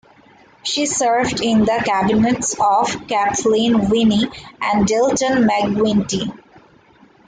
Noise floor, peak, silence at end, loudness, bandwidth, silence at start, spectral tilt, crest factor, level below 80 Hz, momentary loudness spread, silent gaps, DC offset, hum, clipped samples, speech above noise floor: -50 dBFS; -6 dBFS; 0.95 s; -17 LUFS; 9.6 kHz; 0.65 s; -4 dB/octave; 12 dB; -46 dBFS; 7 LU; none; under 0.1%; none; under 0.1%; 33 dB